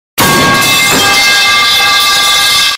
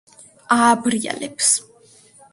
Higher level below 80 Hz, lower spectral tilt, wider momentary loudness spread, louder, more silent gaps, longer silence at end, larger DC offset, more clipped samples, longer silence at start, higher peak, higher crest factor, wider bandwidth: first, -38 dBFS vs -66 dBFS; about the same, -1 dB/octave vs -2 dB/octave; second, 1 LU vs 8 LU; first, -5 LUFS vs -18 LUFS; neither; second, 0 s vs 0.7 s; neither; neither; second, 0.15 s vs 0.5 s; about the same, 0 dBFS vs -2 dBFS; second, 8 dB vs 18 dB; first, 16.5 kHz vs 11.5 kHz